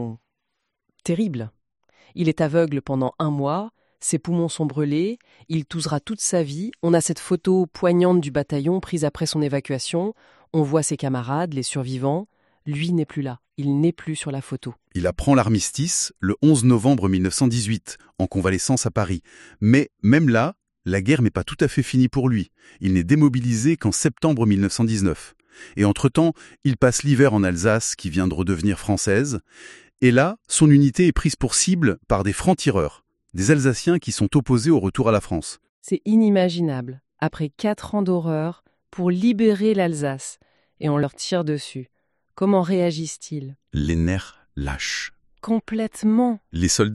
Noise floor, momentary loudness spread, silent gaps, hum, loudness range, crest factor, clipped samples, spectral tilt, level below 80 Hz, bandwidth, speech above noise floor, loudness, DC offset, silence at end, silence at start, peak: -79 dBFS; 12 LU; 35.69-35.82 s; none; 5 LU; 18 dB; under 0.1%; -5.5 dB/octave; -44 dBFS; 12.5 kHz; 58 dB; -21 LUFS; under 0.1%; 0 s; 0 s; -2 dBFS